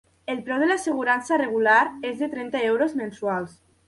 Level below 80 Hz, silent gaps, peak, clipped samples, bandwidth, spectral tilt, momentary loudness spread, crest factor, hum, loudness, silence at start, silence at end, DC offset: -66 dBFS; none; -6 dBFS; under 0.1%; 11.5 kHz; -4.5 dB/octave; 11 LU; 18 dB; none; -23 LUFS; 0.3 s; 0.35 s; under 0.1%